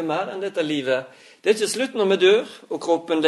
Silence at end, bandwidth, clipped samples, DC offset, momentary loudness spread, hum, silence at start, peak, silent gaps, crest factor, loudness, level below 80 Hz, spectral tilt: 0 s; 12 kHz; under 0.1%; under 0.1%; 9 LU; none; 0 s; -4 dBFS; none; 18 dB; -22 LUFS; -76 dBFS; -3.5 dB/octave